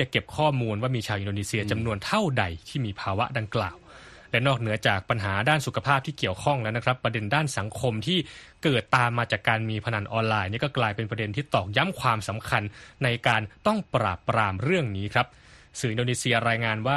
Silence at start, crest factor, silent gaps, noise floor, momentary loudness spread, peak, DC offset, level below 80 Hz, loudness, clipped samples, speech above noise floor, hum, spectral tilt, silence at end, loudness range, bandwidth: 0 s; 20 dB; none; -48 dBFS; 6 LU; -6 dBFS; under 0.1%; -54 dBFS; -26 LUFS; under 0.1%; 22 dB; none; -5 dB/octave; 0 s; 2 LU; 13 kHz